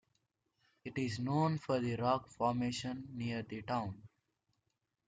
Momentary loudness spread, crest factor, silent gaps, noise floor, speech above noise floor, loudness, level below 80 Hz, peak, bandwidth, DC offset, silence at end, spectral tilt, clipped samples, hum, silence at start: 10 LU; 18 dB; none; -85 dBFS; 48 dB; -37 LUFS; -70 dBFS; -20 dBFS; 9.4 kHz; under 0.1%; 1 s; -6.5 dB/octave; under 0.1%; none; 0.85 s